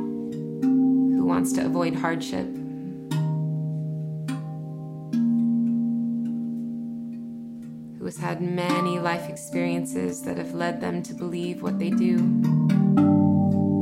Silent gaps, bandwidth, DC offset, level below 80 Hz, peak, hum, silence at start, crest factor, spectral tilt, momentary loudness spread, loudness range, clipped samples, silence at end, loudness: none; 14.5 kHz; under 0.1%; -64 dBFS; -8 dBFS; none; 0 s; 16 dB; -7 dB/octave; 14 LU; 6 LU; under 0.1%; 0 s; -25 LUFS